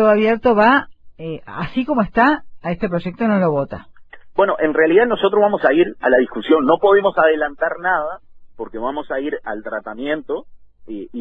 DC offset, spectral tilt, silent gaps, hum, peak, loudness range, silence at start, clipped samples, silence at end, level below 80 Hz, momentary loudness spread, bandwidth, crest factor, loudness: under 0.1%; -8.5 dB/octave; none; none; -2 dBFS; 8 LU; 0 s; under 0.1%; 0 s; -46 dBFS; 15 LU; 5.2 kHz; 16 dB; -17 LUFS